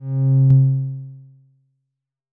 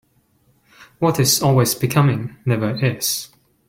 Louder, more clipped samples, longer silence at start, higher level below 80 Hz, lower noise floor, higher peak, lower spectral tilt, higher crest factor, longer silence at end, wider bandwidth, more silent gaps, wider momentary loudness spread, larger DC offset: about the same, -17 LUFS vs -18 LUFS; neither; second, 0 s vs 0.8 s; about the same, -54 dBFS vs -52 dBFS; first, -80 dBFS vs -60 dBFS; about the same, -6 dBFS vs -4 dBFS; first, -14.5 dB/octave vs -4.5 dB/octave; about the same, 14 dB vs 16 dB; first, 1.15 s vs 0.4 s; second, 1.3 kHz vs 17 kHz; neither; first, 20 LU vs 8 LU; neither